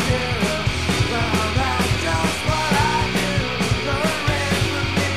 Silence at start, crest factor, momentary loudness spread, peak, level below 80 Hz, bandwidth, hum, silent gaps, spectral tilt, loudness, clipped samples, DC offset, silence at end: 0 s; 14 dB; 2 LU; -6 dBFS; -32 dBFS; 16 kHz; none; none; -4.5 dB/octave; -20 LUFS; under 0.1%; 1%; 0 s